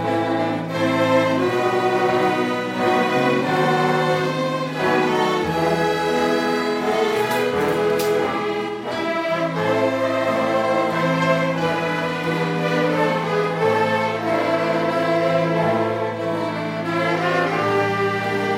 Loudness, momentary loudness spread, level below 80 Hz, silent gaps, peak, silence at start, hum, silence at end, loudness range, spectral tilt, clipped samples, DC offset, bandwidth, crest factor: -20 LUFS; 4 LU; -58 dBFS; none; -4 dBFS; 0 s; none; 0 s; 2 LU; -5.5 dB/octave; under 0.1%; under 0.1%; 16 kHz; 16 dB